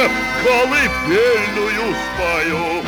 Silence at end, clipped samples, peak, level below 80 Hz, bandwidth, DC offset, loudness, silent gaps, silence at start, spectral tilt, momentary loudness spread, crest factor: 0 s; under 0.1%; -4 dBFS; -38 dBFS; 18 kHz; under 0.1%; -16 LUFS; none; 0 s; -4 dB/octave; 5 LU; 14 dB